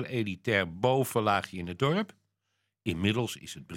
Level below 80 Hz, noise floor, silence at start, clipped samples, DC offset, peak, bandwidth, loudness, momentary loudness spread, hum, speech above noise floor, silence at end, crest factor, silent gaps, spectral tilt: -64 dBFS; -80 dBFS; 0 s; under 0.1%; under 0.1%; -10 dBFS; 16.5 kHz; -30 LUFS; 11 LU; none; 51 dB; 0 s; 20 dB; none; -5.5 dB/octave